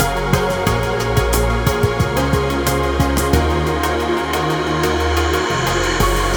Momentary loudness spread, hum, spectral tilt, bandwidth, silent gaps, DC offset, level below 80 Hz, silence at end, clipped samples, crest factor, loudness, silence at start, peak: 2 LU; none; -5 dB/octave; over 20 kHz; none; under 0.1%; -24 dBFS; 0 s; under 0.1%; 16 dB; -17 LUFS; 0 s; 0 dBFS